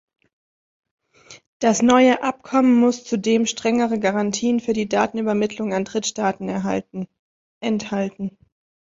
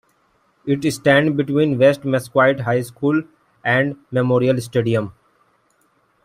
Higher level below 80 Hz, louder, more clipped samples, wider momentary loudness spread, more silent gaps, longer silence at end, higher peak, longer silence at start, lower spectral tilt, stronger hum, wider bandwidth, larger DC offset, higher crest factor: about the same, -60 dBFS vs -58 dBFS; about the same, -20 LUFS vs -18 LUFS; neither; first, 12 LU vs 8 LU; first, 1.46-1.60 s, 7.19-7.61 s vs none; second, 0.6 s vs 1.15 s; about the same, -2 dBFS vs -2 dBFS; first, 1.3 s vs 0.65 s; second, -4.5 dB/octave vs -6.5 dB/octave; neither; second, 7.8 kHz vs 15.5 kHz; neither; about the same, 18 dB vs 18 dB